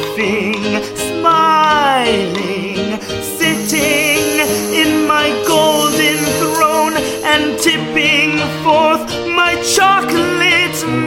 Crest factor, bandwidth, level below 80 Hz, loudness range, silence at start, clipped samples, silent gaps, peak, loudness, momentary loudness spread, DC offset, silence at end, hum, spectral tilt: 14 dB; 16.5 kHz; -44 dBFS; 2 LU; 0 s; under 0.1%; none; 0 dBFS; -13 LUFS; 8 LU; under 0.1%; 0 s; none; -3 dB/octave